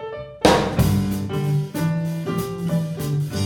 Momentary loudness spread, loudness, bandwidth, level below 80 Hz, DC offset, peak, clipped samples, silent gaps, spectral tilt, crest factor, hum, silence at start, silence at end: 8 LU; -22 LUFS; 18 kHz; -38 dBFS; under 0.1%; -2 dBFS; under 0.1%; none; -6 dB/octave; 20 dB; none; 0 s; 0 s